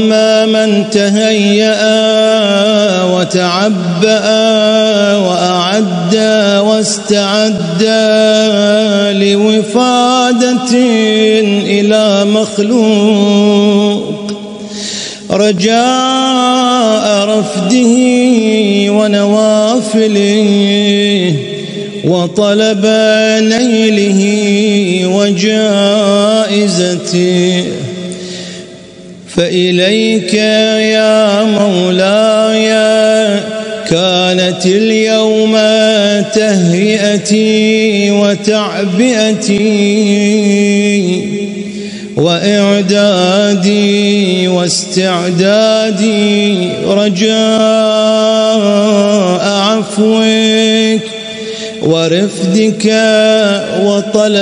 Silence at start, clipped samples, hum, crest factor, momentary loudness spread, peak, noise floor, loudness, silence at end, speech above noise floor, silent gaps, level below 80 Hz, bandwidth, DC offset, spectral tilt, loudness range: 0 s; under 0.1%; none; 10 dB; 5 LU; 0 dBFS; -31 dBFS; -9 LUFS; 0 s; 22 dB; none; -54 dBFS; 10.5 kHz; under 0.1%; -4.5 dB/octave; 2 LU